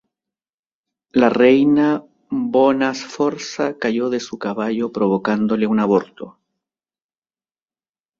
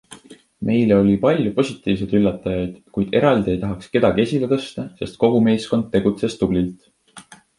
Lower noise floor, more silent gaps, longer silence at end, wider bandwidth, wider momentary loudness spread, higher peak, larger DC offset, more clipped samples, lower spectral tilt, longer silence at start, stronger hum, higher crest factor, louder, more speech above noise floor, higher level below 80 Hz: first, under -90 dBFS vs -45 dBFS; neither; first, 1.9 s vs 0.4 s; second, 7.6 kHz vs 11.5 kHz; about the same, 12 LU vs 10 LU; about the same, -2 dBFS vs -2 dBFS; neither; neither; second, -6 dB/octave vs -7.5 dB/octave; first, 1.15 s vs 0.1 s; neither; about the same, 18 dB vs 18 dB; about the same, -18 LUFS vs -19 LUFS; first, over 73 dB vs 26 dB; second, -60 dBFS vs -44 dBFS